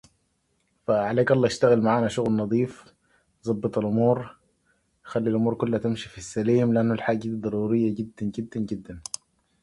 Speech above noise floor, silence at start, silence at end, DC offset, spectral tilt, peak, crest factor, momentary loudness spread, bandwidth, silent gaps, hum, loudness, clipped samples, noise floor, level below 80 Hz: 47 dB; 0.9 s; 0.65 s; under 0.1%; -6.5 dB/octave; -6 dBFS; 20 dB; 13 LU; 11.5 kHz; none; none; -25 LUFS; under 0.1%; -71 dBFS; -58 dBFS